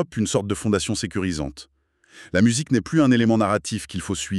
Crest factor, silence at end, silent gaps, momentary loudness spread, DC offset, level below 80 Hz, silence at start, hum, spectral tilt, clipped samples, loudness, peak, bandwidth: 18 dB; 0 s; none; 11 LU; under 0.1%; -48 dBFS; 0 s; none; -5 dB/octave; under 0.1%; -22 LUFS; -4 dBFS; 12.5 kHz